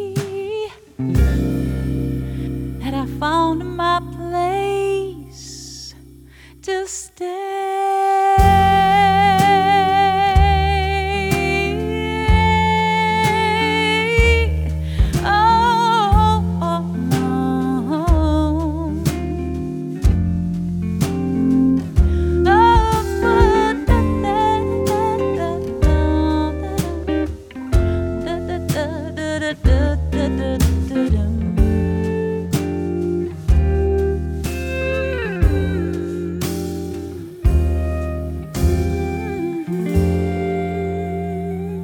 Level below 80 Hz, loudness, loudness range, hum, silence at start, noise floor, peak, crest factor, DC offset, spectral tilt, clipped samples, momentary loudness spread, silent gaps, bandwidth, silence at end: -24 dBFS; -18 LUFS; 7 LU; none; 0 s; -43 dBFS; 0 dBFS; 16 dB; under 0.1%; -6.5 dB/octave; under 0.1%; 11 LU; none; 18.5 kHz; 0 s